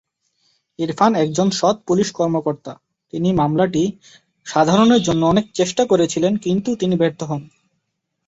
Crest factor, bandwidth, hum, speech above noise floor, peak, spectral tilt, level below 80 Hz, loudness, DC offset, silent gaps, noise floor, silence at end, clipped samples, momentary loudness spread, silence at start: 16 dB; 8 kHz; none; 57 dB; -2 dBFS; -5.5 dB/octave; -52 dBFS; -18 LUFS; under 0.1%; none; -74 dBFS; 0.8 s; under 0.1%; 12 LU; 0.8 s